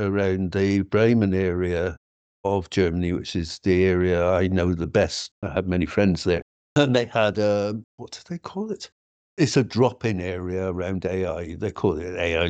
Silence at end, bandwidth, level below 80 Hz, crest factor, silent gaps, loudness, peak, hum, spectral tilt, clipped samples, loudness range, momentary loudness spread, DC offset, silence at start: 0 s; 8.8 kHz; -46 dBFS; 18 dB; 1.97-2.44 s, 5.31-5.42 s, 6.42-6.76 s, 7.84-7.98 s, 8.92-9.37 s; -23 LUFS; -6 dBFS; none; -6.5 dB/octave; under 0.1%; 3 LU; 11 LU; under 0.1%; 0 s